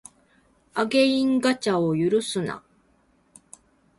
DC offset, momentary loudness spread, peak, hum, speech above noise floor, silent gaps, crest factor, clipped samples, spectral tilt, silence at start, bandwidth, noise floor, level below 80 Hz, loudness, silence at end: under 0.1%; 12 LU; -8 dBFS; none; 41 dB; none; 18 dB; under 0.1%; -5 dB/octave; 0.75 s; 11.5 kHz; -63 dBFS; -64 dBFS; -23 LUFS; 1.4 s